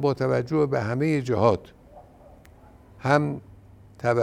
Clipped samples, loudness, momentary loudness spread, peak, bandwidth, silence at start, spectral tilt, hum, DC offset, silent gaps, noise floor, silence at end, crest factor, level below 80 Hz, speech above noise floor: under 0.1%; -24 LUFS; 9 LU; -4 dBFS; 12 kHz; 0 s; -7.5 dB/octave; none; under 0.1%; none; -51 dBFS; 0 s; 20 dB; -56 dBFS; 28 dB